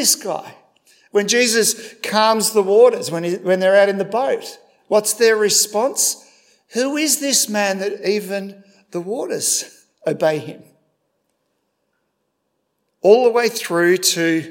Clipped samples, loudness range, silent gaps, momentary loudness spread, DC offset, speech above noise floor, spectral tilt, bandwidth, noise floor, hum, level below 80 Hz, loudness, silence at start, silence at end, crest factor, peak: under 0.1%; 8 LU; none; 14 LU; under 0.1%; 55 dB; -2.5 dB/octave; 16.5 kHz; -72 dBFS; none; -80 dBFS; -17 LUFS; 0 s; 0 s; 18 dB; 0 dBFS